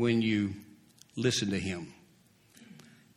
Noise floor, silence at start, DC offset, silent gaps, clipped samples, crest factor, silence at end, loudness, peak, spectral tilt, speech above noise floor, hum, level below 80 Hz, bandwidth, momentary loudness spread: -63 dBFS; 0 s; under 0.1%; none; under 0.1%; 18 dB; 0.4 s; -31 LUFS; -16 dBFS; -5 dB/octave; 34 dB; none; -66 dBFS; 13.5 kHz; 22 LU